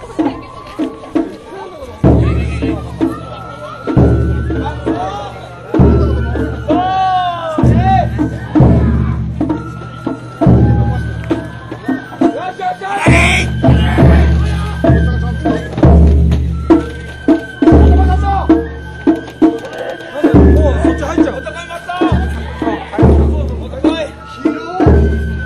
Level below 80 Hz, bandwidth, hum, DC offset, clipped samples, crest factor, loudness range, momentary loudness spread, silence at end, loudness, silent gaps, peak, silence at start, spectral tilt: -18 dBFS; 10.5 kHz; none; under 0.1%; under 0.1%; 12 dB; 4 LU; 14 LU; 0 s; -13 LUFS; none; 0 dBFS; 0 s; -8 dB/octave